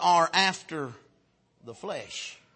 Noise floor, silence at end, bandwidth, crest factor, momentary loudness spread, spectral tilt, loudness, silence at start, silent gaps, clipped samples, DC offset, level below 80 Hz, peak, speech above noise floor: -68 dBFS; 0.2 s; 8.8 kHz; 22 dB; 19 LU; -2.5 dB/octave; -27 LUFS; 0 s; none; under 0.1%; under 0.1%; -76 dBFS; -8 dBFS; 40 dB